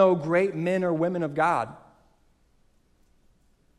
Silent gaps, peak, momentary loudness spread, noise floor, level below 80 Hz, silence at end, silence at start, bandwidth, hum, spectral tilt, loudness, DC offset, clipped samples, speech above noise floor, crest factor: none; -8 dBFS; 5 LU; -63 dBFS; -64 dBFS; 2 s; 0 s; 11.5 kHz; none; -7.5 dB/octave; -25 LUFS; under 0.1%; under 0.1%; 39 dB; 20 dB